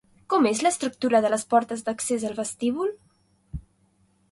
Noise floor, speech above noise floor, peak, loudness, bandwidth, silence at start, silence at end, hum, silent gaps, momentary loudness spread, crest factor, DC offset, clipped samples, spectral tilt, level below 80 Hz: -65 dBFS; 41 dB; -8 dBFS; -24 LUFS; 11.5 kHz; 0.3 s; 0.7 s; none; none; 18 LU; 18 dB; under 0.1%; under 0.1%; -4 dB/octave; -52 dBFS